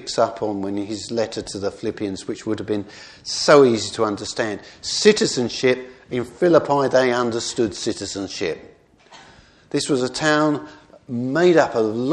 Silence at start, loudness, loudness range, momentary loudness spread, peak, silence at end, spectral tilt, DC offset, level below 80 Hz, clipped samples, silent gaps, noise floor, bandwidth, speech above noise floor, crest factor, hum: 0 s; -20 LUFS; 6 LU; 12 LU; 0 dBFS; 0 s; -4 dB/octave; under 0.1%; -56 dBFS; under 0.1%; none; -49 dBFS; 10.5 kHz; 29 dB; 20 dB; none